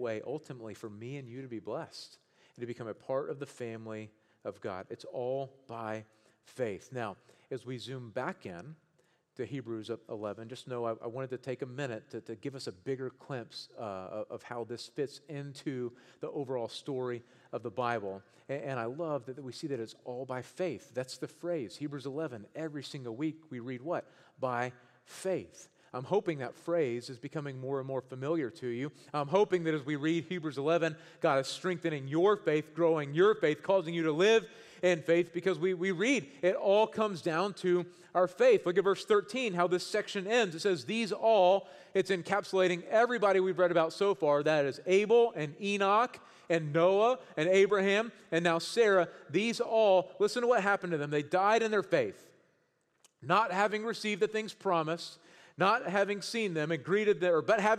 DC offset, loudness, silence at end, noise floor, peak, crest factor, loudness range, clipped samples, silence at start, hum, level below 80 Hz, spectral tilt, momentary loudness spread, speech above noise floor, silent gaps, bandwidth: under 0.1%; -32 LUFS; 0 s; -75 dBFS; -14 dBFS; 20 dB; 12 LU; under 0.1%; 0 s; none; -82 dBFS; -5.5 dB/octave; 15 LU; 43 dB; none; 13 kHz